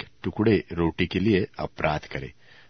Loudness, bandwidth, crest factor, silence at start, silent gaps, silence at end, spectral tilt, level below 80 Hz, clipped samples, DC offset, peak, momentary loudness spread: -25 LUFS; 6.4 kHz; 20 dB; 0 s; none; 0.4 s; -8 dB/octave; -46 dBFS; under 0.1%; 0.2%; -6 dBFS; 13 LU